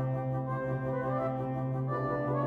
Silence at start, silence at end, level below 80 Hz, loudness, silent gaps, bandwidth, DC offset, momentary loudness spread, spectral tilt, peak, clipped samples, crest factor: 0 s; 0 s; -58 dBFS; -33 LUFS; none; 4.3 kHz; under 0.1%; 2 LU; -10.5 dB/octave; -18 dBFS; under 0.1%; 14 dB